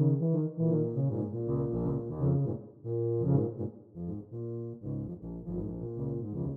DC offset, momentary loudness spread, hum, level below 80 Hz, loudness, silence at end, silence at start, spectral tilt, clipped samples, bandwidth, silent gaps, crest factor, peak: under 0.1%; 11 LU; none; -54 dBFS; -33 LUFS; 0 s; 0 s; -14.5 dB/octave; under 0.1%; 1.6 kHz; none; 18 dB; -14 dBFS